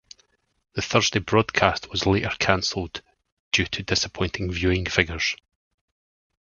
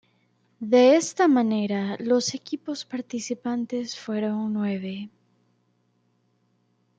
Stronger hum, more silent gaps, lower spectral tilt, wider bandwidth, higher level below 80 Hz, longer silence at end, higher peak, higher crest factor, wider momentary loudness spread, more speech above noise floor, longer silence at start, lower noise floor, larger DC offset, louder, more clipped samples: second, none vs 60 Hz at -50 dBFS; first, 3.32-3.51 s vs none; about the same, -4 dB/octave vs -5 dB/octave; second, 7.4 kHz vs 9.2 kHz; first, -42 dBFS vs -74 dBFS; second, 1.05 s vs 1.9 s; first, 0 dBFS vs -8 dBFS; first, 26 dB vs 18 dB; second, 10 LU vs 14 LU; about the same, 42 dB vs 45 dB; first, 0.75 s vs 0.6 s; about the same, -65 dBFS vs -68 dBFS; neither; about the same, -23 LUFS vs -24 LUFS; neither